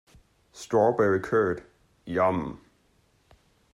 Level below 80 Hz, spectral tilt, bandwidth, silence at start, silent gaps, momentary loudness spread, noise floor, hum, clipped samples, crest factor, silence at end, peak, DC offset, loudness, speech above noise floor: -60 dBFS; -7 dB/octave; 14 kHz; 0.55 s; none; 15 LU; -66 dBFS; none; under 0.1%; 20 dB; 1.15 s; -8 dBFS; under 0.1%; -25 LUFS; 41 dB